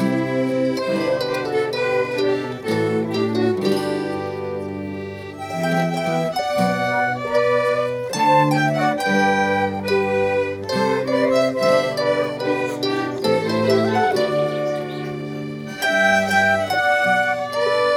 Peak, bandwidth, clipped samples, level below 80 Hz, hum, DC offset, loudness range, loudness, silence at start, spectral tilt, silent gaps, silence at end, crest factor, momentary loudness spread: -4 dBFS; 16.5 kHz; under 0.1%; -58 dBFS; none; under 0.1%; 4 LU; -20 LUFS; 0 s; -5.5 dB/octave; none; 0 s; 16 dB; 10 LU